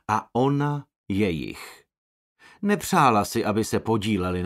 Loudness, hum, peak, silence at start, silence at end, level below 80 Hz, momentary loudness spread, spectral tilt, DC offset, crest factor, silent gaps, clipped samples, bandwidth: -24 LUFS; none; -6 dBFS; 0.1 s; 0 s; -54 dBFS; 14 LU; -5.5 dB/octave; under 0.1%; 20 dB; 0.96-1.04 s, 1.98-2.36 s; under 0.1%; 16 kHz